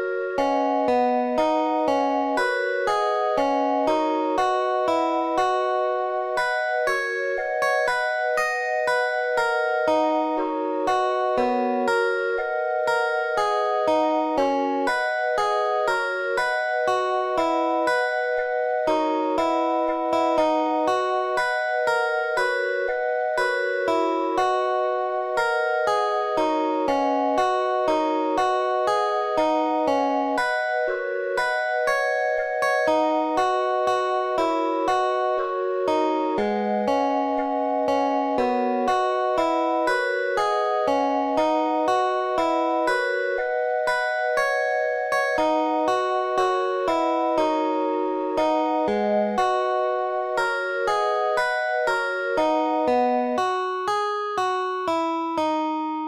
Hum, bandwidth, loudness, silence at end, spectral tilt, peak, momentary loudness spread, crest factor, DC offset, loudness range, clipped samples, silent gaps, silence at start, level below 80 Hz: none; 14.5 kHz; -23 LUFS; 0 s; -4 dB/octave; -8 dBFS; 3 LU; 14 dB; under 0.1%; 1 LU; under 0.1%; none; 0 s; -58 dBFS